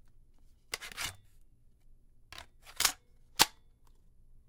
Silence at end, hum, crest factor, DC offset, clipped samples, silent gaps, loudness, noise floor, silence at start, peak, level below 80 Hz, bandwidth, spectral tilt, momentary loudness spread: 1 s; none; 36 dB; under 0.1%; under 0.1%; none; -32 LUFS; -60 dBFS; 0.7 s; -2 dBFS; -60 dBFS; 17 kHz; 0.5 dB/octave; 23 LU